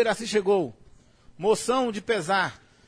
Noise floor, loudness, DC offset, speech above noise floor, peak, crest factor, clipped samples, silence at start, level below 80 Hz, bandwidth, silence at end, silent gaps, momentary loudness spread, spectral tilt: -53 dBFS; -25 LUFS; under 0.1%; 28 dB; -10 dBFS; 16 dB; under 0.1%; 0 s; -60 dBFS; 11 kHz; 0.3 s; none; 6 LU; -4 dB/octave